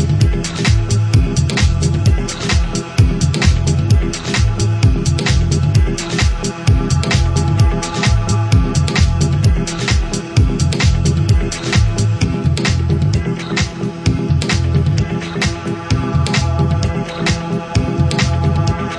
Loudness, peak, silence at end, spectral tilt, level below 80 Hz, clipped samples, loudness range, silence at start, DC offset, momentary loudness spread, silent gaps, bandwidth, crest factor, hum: -15 LUFS; 0 dBFS; 0 s; -5.5 dB/octave; -20 dBFS; under 0.1%; 2 LU; 0 s; under 0.1%; 4 LU; none; 11 kHz; 14 dB; none